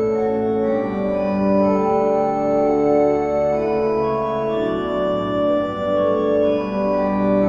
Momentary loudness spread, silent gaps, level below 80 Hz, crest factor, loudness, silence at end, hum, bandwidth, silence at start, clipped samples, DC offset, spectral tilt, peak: 4 LU; none; -46 dBFS; 12 dB; -19 LUFS; 0 s; none; 7 kHz; 0 s; under 0.1%; under 0.1%; -8.5 dB/octave; -6 dBFS